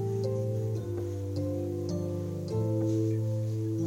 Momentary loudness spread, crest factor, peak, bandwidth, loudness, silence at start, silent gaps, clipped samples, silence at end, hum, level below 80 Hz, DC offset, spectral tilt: 5 LU; 10 dB; -20 dBFS; 15 kHz; -32 LUFS; 0 s; none; under 0.1%; 0 s; none; -60 dBFS; under 0.1%; -9 dB/octave